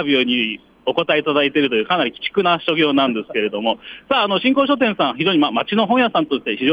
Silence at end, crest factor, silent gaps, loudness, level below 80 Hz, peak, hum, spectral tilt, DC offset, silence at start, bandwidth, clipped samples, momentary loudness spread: 0 s; 14 dB; none; -18 LUFS; -62 dBFS; -4 dBFS; none; -7 dB/octave; under 0.1%; 0 s; 5.4 kHz; under 0.1%; 6 LU